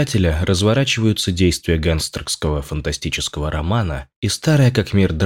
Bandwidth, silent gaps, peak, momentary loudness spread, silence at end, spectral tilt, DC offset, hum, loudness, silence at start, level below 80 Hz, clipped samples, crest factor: 16.5 kHz; 4.16-4.22 s; -4 dBFS; 8 LU; 0 s; -5 dB/octave; under 0.1%; none; -18 LUFS; 0 s; -30 dBFS; under 0.1%; 14 dB